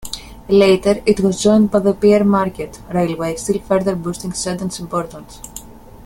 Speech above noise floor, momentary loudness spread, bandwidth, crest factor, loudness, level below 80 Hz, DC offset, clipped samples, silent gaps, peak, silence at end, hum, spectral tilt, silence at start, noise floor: 20 dB; 18 LU; 16.5 kHz; 16 dB; -16 LUFS; -42 dBFS; under 0.1%; under 0.1%; none; 0 dBFS; 0 s; none; -5.5 dB/octave; 0 s; -36 dBFS